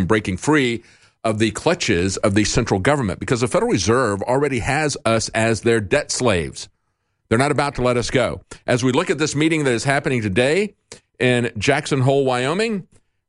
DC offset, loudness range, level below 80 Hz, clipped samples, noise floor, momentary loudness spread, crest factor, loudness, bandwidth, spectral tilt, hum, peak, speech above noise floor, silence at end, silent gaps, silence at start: under 0.1%; 2 LU; -42 dBFS; under 0.1%; -71 dBFS; 5 LU; 18 dB; -19 LUFS; 11.5 kHz; -5 dB/octave; none; -2 dBFS; 52 dB; 0.45 s; none; 0 s